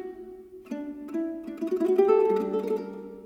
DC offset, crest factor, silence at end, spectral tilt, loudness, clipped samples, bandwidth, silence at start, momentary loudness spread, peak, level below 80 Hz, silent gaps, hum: under 0.1%; 18 dB; 0 s; -7.5 dB/octave; -27 LUFS; under 0.1%; 13.5 kHz; 0 s; 20 LU; -10 dBFS; -66 dBFS; none; none